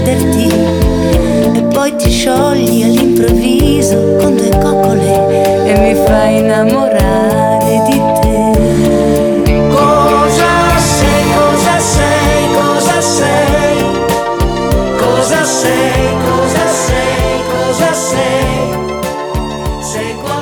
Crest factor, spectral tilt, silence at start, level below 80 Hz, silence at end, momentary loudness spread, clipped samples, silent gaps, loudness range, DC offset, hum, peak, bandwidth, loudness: 10 dB; -5 dB/octave; 0 s; -22 dBFS; 0 s; 5 LU; under 0.1%; none; 3 LU; under 0.1%; none; 0 dBFS; over 20 kHz; -10 LUFS